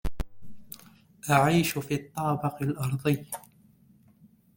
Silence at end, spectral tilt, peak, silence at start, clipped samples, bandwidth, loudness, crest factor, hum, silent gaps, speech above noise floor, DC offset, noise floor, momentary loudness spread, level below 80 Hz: 1.15 s; -5.5 dB/octave; -6 dBFS; 0.05 s; under 0.1%; 17 kHz; -27 LUFS; 24 dB; none; none; 33 dB; under 0.1%; -59 dBFS; 23 LU; -44 dBFS